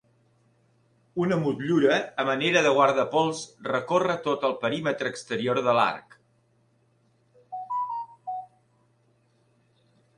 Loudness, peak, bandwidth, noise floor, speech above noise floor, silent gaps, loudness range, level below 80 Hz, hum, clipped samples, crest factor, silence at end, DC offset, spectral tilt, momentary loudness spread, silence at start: -25 LUFS; -6 dBFS; 11 kHz; -66 dBFS; 42 dB; none; 14 LU; -70 dBFS; none; under 0.1%; 20 dB; 1.7 s; under 0.1%; -5 dB/octave; 15 LU; 1.15 s